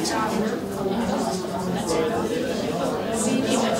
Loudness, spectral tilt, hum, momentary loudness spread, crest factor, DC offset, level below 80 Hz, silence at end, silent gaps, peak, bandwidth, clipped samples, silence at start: -25 LUFS; -4.5 dB/octave; none; 4 LU; 14 dB; under 0.1%; -50 dBFS; 0 s; none; -10 dBFS; 16 kHz; under 0.1%; 0 s